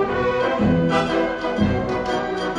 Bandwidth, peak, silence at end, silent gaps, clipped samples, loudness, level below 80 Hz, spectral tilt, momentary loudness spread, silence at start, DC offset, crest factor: 10.5 kHz; -4 dBFS; 0 s; none; under 0.1%; -21 LUFS; -40 dBFS; -6.5 dB/octave; 4 LU; 0 s; under 0.1%; 16 dB